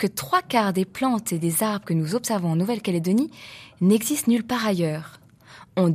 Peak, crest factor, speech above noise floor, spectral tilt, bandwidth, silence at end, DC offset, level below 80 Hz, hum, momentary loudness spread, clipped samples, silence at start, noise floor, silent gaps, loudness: -8 dBFS; 16 dB; 25 dB; -5.5 dB/octave; 15.5 kHz; 0 s; under 0.1%; -64 dBFS; none; 9 LU; under 0.1%; 0 s; -48 dBFS; none; -23 LUFS